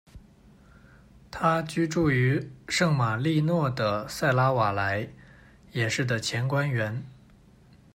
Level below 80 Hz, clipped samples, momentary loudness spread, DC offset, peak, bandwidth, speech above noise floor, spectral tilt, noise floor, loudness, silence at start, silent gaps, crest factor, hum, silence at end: -56 dBFS; under 0.1%; 9 LU; under 0.1%; -10 dBFS; 15.5 kHz; 30 dB; -5.5 dB/octave; -55 dBFS; -26 LUFS; 0.15 s; none; 18 dB; none; 0.8 s